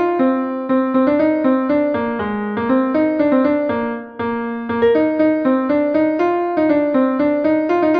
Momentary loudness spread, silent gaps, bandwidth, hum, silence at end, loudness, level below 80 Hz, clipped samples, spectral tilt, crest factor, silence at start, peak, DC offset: 7 LU; none; 5.2 kHz; none; 0 s; -17 LUFS; -52 dBFS; under 0.1%; -8.5 dB/octave; 12 dB; 0 s; -4 dBFS; under 0.1%